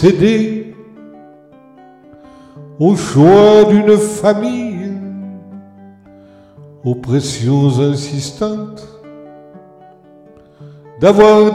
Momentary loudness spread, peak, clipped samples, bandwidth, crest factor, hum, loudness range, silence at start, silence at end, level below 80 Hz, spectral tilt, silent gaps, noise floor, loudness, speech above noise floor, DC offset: 20 LU; 0 dBFS; under 0.1%; 12.5 kHz; 14 dB; none; 9 LU; 0 s; 0 s; -46 dBFS; -6.5 dB/octave; none; -43 dBFS; -12 LUFS; 32 dB; under 0.1%